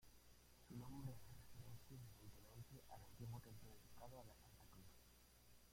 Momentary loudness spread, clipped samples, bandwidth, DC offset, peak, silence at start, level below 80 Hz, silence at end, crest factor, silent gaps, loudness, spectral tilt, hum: 10 LU; under 0.1%; 16.5 kHz; under 0.1%; -40 dBFS; 0 s; -72 dBFS; 0 s; 20 dB; none; -61 LUFS; -5.5 dB/octave; 60 Hz at -70 dBFS